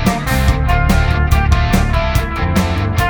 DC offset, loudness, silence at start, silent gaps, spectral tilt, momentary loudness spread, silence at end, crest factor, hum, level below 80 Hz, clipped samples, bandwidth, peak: under 0.1%; -15 LUFS; 0 s; none; -6 dB/octave; 3 LU; 0 s; 14 dB; none; -16 dBFS; under 0.1%; over 20 kHz; 0 dBFS